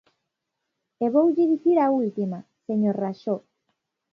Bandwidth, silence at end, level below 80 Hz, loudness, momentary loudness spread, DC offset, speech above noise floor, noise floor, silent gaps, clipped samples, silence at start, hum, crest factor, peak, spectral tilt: 5.8 kHz; 0.75 s; -78 dBFS; -23 LUFS; 11 LU; under 0.1%; 59 dB; -81 dBFS; none; under 0.1%; 1 s; none; 16 dB; -8 dBFS; -10 dB/octave